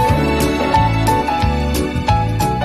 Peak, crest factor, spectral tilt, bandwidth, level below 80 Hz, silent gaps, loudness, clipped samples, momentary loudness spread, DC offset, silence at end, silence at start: -2 dBFS; 14 dB; -6 dB/octave; 13.5 kHz; -24 dBFS; none; -16 LUFS; under 0.1%; 3 LU; 0.6%; 0 s; 0 s